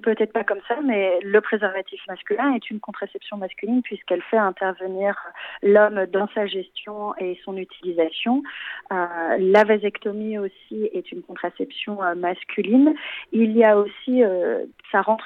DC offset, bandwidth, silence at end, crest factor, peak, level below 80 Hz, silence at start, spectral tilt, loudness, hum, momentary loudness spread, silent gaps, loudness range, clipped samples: under 0.1%; 6.2 kHz; 0 s; 18 dB; -4 dBFS; -72 dBFS; 0.05 s; -7.5 dB/octave; -22 LUFS; none; 15 LU; none; 5 LU; under 0.1%